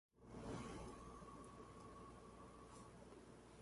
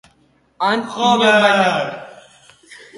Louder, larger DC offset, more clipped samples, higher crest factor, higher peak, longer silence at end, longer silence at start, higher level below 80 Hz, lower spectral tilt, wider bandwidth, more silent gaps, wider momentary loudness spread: second, -58 LUFS vs -15 LUFS; neither; neither; about the same, 18 dB vs 18 dB; second, -40 dBFS vs 0 dBFS; second, 0 s vs 0.25 s; second, 0.15 s vs 0.6 s; second, -68 dBFS vs -62 dBFS; first, -5.5 dB/octave vs -4 dB/octave; about the same, 11.5 kHz vs 11.5 kHz; neither; second, 9 LU vs 12 LU